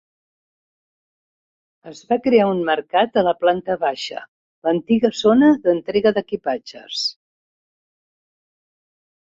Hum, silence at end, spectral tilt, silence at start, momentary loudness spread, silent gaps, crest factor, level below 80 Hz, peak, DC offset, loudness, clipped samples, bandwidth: none; 2.25 s; -5.5 dB/octave; 1.85 s; 12 LU; 4.28-4.62 s; 18 dB; -62 dBFS; -2 dBFS; under 0.1%; -19 LUFS; under 0.1%; 7.8 kHz